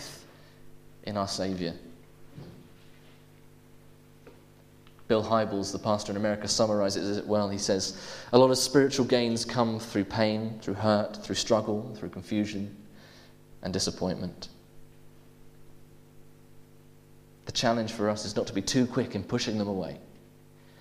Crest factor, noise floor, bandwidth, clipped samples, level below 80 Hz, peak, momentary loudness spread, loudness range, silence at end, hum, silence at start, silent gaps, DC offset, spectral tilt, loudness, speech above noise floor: 28 dB; -55 dBFS; 15.5 kHz; under 0.1%; -58 dBFS; -2 dBFS; 16 LU; 12 LU; 0.65 s; none; 0 s; none; under 0.1%; -4.5 dB/octave; -28 LUFS; 27 dB